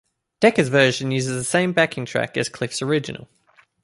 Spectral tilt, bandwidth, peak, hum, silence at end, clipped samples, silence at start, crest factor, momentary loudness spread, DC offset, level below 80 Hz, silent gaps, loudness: -4.5 dB/octave; 11.5 kHz; -2 dBFS; none; 0.6 s; under 0.1%; 0.4 s; 18 dB; 8 LU; under 0.1%; -60 dBFS; none; -20 LUFS